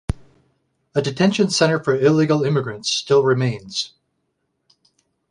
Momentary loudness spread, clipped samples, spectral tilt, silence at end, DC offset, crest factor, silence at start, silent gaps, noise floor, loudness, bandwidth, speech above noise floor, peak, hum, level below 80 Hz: 10 LU; under 0.1%; -5 dB/octave; 1.45 s; under 0.1%; 18 dB; 0.1 s; none; -72 dBFS; -19 LUFS; 11.5 kHz; 54 dB; -2 dBFS; none; -42 dBFS